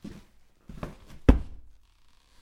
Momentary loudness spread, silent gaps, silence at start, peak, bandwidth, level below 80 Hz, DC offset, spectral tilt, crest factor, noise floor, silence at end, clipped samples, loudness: 23 LU; none; 0.05 s; 0 dBFS; 8.6 kHz; -32 dBFS; under 0.1%; -8.5 dB/octave; 30 dB; -59 dBFS; 0.85 s; under 0.1%; -26 LUFS